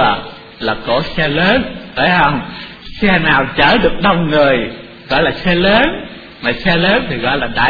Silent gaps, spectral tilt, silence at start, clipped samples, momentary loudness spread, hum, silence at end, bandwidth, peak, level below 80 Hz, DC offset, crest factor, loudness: none; -7.5 dB/octave; 0 s; under 0.1%; 13 LU; none; 0 s; 5.4 kHz; 0 dBFS; -32 dBFS; under 0.1%; 14 dB; -13 LUFS